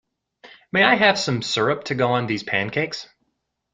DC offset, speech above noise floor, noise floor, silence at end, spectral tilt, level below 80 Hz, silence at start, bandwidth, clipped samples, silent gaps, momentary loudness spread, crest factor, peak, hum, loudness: under 0.1%; 54 dB; -75 dBFS; 0.7 s; -4.5 dB/octave; -60 dBFS; 0.45 s; 9.6 kHz; under 0.1%; none; 10 LU; 20 dB; -2 dBFS; none; -20 LUFS